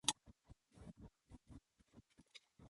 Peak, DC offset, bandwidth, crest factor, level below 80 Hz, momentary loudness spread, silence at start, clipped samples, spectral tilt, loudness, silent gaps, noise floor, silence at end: -16 dBFS; under 0.1%; 11.5 kHz; 36 dB; -70 dBFS; 14 LU; 0.05 s; under 0.1%; -1 dB/octave; -52 LUFS; none; -70 dBFS; 0 s